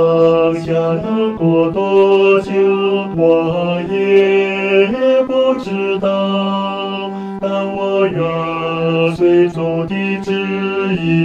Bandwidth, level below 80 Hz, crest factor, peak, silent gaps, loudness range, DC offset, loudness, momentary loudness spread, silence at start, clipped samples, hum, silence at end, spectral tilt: 7.6 kHz; -48 dBFS; 14 dB; 0 dBFS; none; 4 LU; under 0.1%; -15 LUFS; 7 LU; 0 s; under 0.1%; none; 0 s; -7.5 dB/octave